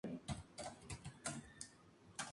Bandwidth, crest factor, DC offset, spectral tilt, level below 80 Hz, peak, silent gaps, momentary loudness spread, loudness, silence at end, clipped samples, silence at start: 11.5 kHz; 22 dB; under 0.1%; -3.5 dB/octave; -64 dBFS; -30 dBFS; none; 7 LU; -51 LUFS; 0 s; under 0.1%; 0.05 s